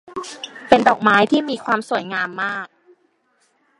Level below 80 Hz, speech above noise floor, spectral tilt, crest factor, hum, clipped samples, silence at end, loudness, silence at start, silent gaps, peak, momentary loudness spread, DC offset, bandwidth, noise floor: -60 dBFS; 45 dB; -4.5 dB/octave; 20 dB; none; under 0.1%; 1.15 s; -18 LUFS; 0.1 s; none; 0 dBFS; 18 LU; under 0.1%; 11.5 kHz; -63 dBFS